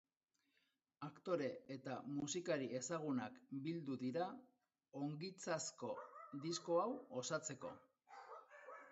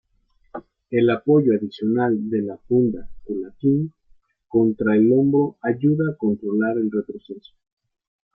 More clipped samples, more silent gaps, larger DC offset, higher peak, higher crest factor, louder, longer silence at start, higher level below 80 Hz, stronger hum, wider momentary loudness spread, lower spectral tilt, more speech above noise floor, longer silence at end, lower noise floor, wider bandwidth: neither; neither; neither; second, -26 dBFS vs -6 dBFS; first, 20 dB vs 14 dB; second, -46 LUFS vs -21 LUFS; first, 1 s vs 0.55 s; second, -88 dBFS vs -56 dBFS; neither; about the same, 16 LU vs 18 LU; second, -5 dB/octave vs -11 dB/octave; about the same, 43 dB vs 42 dB; second, 0 s vs 0.95 s; first, -88 dBFS vs -62 dBFS; first, 8 kHz vs 5.2 kHz